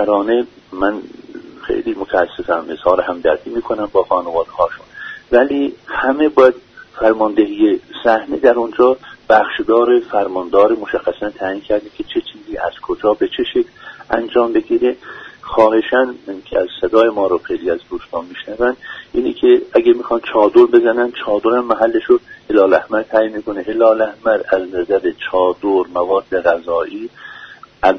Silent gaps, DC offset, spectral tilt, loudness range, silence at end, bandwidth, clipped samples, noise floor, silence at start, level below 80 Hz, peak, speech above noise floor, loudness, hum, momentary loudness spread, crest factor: none; under 0.1%; -6.5 dB/octave; 5 LU; 0 s; 6.2 kHz; under 0.1%; -38 dBFS; 0 s; -48 dBFS; 0 dBFS; 23 dB; -15 LUFS; none; 13 LU; 16 dB